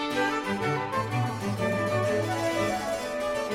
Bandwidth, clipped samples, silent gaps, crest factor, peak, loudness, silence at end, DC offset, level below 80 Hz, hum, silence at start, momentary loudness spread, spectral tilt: 16 kHz; under 0.1%; none; 14 dB; -14 dBFS; -28 LUFS; 0 s; under 0.1%; -56 dBFS; none; 0 s; 3 LU; -5.5 dB/octave